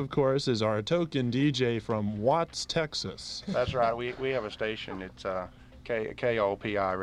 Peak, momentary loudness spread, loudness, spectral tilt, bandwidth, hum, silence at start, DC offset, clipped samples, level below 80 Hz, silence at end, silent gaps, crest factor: -14 dBFS; 10 LU; -30 LUFS; -5.5 dB/octave; 11.5 kHz; none; 0 s; under 0.1%; under 0.1%; -54 dBFS; 0 s; none; 16 dB